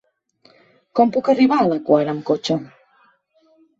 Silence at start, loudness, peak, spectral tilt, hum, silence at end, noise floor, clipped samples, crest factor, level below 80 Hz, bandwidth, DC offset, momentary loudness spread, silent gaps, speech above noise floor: 0.95 s; -18 LUFS; -2 dBFS; -6.5 dB/octave; none; 1.15 s; -59 dBFS; under 0.1%; 18 dB; -64 dBFS; 7.8 kHz; under 0.1%; 8 LU; none; 42 dB